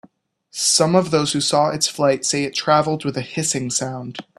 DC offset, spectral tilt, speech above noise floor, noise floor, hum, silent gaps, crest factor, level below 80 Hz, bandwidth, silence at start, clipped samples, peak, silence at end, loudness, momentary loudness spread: under 0.1%; -3.5 dB/octave; 35 dB; -54 dBFS; none; none; 20 dB; -60 dBFS; 15 kHz; 0.55 s; under 0.1%; 0 dBFS; 0.15 s; -18 LUFS; 9 LU